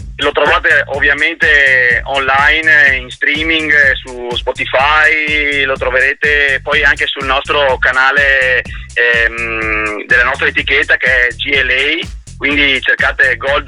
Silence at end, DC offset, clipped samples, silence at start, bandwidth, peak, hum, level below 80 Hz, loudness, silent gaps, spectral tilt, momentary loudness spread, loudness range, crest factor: 0 s; under 0.1%; under 0.1%; 0 s; 11 kHz; 0 dBFS; none; -30 dBFS; -10 LUFS; none; -3.5 dB/octave; 7 LU; 2 LU; 12 dB